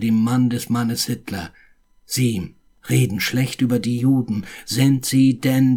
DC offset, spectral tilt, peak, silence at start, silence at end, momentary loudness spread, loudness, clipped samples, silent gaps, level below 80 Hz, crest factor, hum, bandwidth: under 0.1%; -5.5 dB/octave; -4 dBFS; 0 s; 0 s; 12 LU; -20 LUFS; under 0.1%; none; -52 dBFS; 14 dB; none; 18 kHz